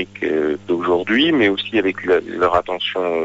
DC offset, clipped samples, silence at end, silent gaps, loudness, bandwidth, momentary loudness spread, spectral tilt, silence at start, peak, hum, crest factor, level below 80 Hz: under 0.1%; under 0.1%; 0 s; none; -18 LUFS; 8 kHz; 6 LU; -6 dB/octave; 0 s; -4 dBFS; none; 14 dB; -50 dBFS